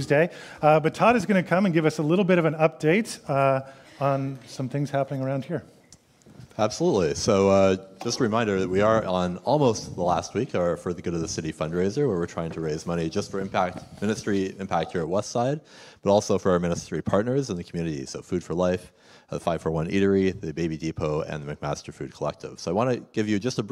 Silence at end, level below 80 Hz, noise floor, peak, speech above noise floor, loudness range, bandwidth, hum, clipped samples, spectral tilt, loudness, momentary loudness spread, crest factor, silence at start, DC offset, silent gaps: 0 s; -54 dBFS; -55 dBFS; -4 dBFS; 31 dB; 5 LU; 14 kHz; none; under 0.1%; -6 dB/octave; -25 LUFS; 11 LU; 20 dB; 0 s; under 0.1%; none